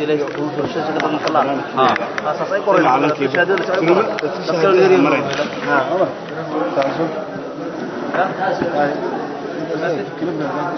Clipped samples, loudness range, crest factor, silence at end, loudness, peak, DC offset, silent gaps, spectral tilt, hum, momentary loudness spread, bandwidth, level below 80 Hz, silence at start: under 0.1%; 6 LU; 16 dB; 0 s; -18 LUFS; -2 dBFS; under 0.1%; none; -6 dB/octave; none; 11 LU; 6.4 kHz; -60 dBFS; 0 s